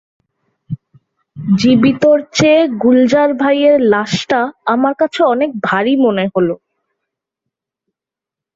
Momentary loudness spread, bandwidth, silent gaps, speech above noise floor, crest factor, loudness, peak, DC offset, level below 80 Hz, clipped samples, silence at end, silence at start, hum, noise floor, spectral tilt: 10 LU; 7.8 kHz; none; 74 dB; 14 dB; -13 LUFS; 0 dBFS; under 0.1%; -54 dBFS; under 0.1%; 2 s; 0.7 s; none; -86 dBFS; -5.5 dB/octave